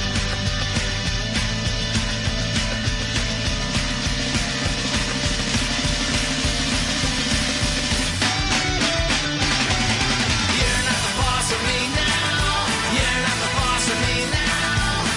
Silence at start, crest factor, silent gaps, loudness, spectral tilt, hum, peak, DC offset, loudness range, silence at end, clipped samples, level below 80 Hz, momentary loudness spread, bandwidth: 0 s; 14 dB; none; -20 LUFS; -3 dB/octave; none; -8 dBFS; under 0.1%; 3 LU; 0 s; under 0.1%; -30 dBFS; 4 LU; 11.5 kHz